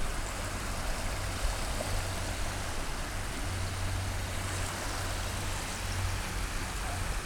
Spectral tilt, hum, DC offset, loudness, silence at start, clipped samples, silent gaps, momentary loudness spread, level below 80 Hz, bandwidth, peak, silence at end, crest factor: -3.5 dB/octave; none; under 0.1%; -35 LUFS; 0 s; under 0.1%; none; 2 LU; -38 dBFS; 18.5 kHz; -18 dBFS; 0 s; 16 dB